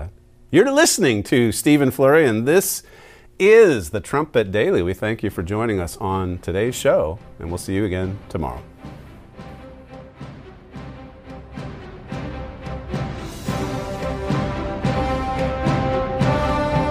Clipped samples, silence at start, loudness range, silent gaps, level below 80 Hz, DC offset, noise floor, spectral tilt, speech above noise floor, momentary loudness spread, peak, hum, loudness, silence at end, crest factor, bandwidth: under 0.1%; 0 s; 18 LU; none; -38 dBFS; under 0.1%; -40 dBFS; -5 dB/octave; 22 dB; 24 LU; -2 dBFS; none; -20 LUFS; 0 s; 18 dB; 16 kHz